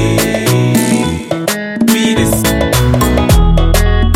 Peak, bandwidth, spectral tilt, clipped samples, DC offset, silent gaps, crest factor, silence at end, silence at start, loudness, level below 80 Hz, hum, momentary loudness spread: 0 dBFS; 16.5 kHz; -5 dB/octave; under 0.1%; under 0.1%; none; 10 dB; 0 s; 0 s; -12 LUFS; -16 dBFS; none; 6 LU